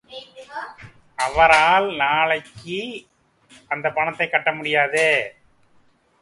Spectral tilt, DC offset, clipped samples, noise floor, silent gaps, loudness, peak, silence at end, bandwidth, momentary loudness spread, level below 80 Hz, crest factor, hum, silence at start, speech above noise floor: -3 dB/octave; under 0.1%; under 0.1%; -58 dBFS; none; -19 LUFS; -2 dBFS; 0.9 s; 11.5 kHz; 22 LU; -50 dBFS; 20 dB; none; 0.1 s; 38 dB